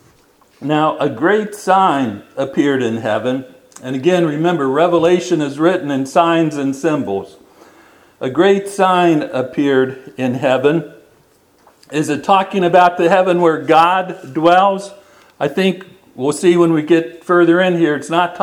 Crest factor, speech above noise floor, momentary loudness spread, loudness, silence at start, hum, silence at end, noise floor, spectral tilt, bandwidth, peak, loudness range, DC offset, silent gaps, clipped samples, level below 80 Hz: 14 dB; 38 dB; 11 LU; -15 LUFS; 0.6 s; none; 0 s; -52 dBFS; -6 dB/octave; 12.5 kHz; 0 dBFS; 4 LU; under 0.1%; none; under 0.1%; -62 dBFS